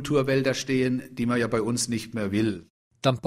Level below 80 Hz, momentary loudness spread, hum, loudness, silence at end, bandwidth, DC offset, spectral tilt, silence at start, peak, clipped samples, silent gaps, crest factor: -58 dBFS; 5 LU; none; -26 LUFS; 0 s; 15.5 kHz; under 0.1%; -5 dB/octave; 0 s; -8 dBFS; under 0.1%; 2.70-2.91 s; 18 dB